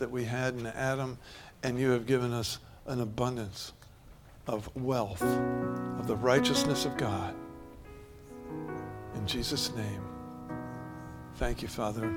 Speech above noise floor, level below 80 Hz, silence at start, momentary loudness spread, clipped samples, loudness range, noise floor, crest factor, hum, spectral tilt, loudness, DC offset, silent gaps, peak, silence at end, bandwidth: 22 dB; -50 dBFS; 0 s; 17 LU; under 0.1%; 7 LU; -53 dBFS; 22 dB; none; -5 dB/octave; -33 LUFS; under 0.1%; none; -12 dBFS; 0 s; 18.5 kHz